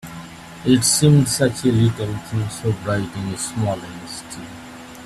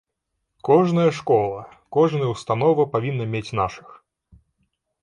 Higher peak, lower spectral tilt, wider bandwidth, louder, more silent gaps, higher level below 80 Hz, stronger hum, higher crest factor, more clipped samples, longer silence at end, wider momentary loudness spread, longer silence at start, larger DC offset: about the same, -2 dBFS vs -4 dBFS; second, -5 dB/octave vs -7.5 dB/octave; first, 14.5 kHz vs 10 kHz; about the same, -19 LUFS vs -21 LUFS; neither; first, -48 dBFS vs -56 dBFS; neither; about the same, 18 dB vs 18 dB; neither; second, 0 s vs 1.25 s; first, 22 LU vs 10 LU; second, 0.05 s vs 0.65 s; neither